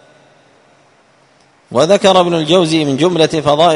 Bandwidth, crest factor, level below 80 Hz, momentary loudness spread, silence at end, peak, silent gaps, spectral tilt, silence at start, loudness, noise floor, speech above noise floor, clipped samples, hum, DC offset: 11 kHz; 14 dB; -52 dBFS; 5 LU; 0 s; 0 dBFS; none; -5 dB/octave; 1.7 s; -12 LUFS; -50 dBFS; 39 dB; under 0.1%; none; under 0.1%